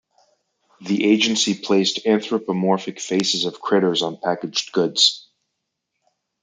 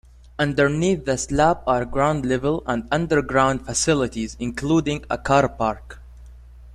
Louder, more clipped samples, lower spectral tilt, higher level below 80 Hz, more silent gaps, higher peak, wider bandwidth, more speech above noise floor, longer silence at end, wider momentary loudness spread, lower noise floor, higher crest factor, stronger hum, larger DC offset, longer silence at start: about the same, -19 LUFS vs -21 LUFS; neither; second, -3.5 dB/octave vs -5 dB/octave; second, -70 dBFS vs -40 dBFS; neither; about the same, -2 dBFS vs -4 dBFS; second, 9.6 kHz vs 13.5 kHz; first, 58 dB vs 22 dB; first, 1.25 s vs 0 s; about the same, 7 LU vs 7 LU; first, -78 dBFS vs -43 dBFS; about the same, 20 dB vs 18 dB; neither; neither; first, 0.8 s vs 0.4 s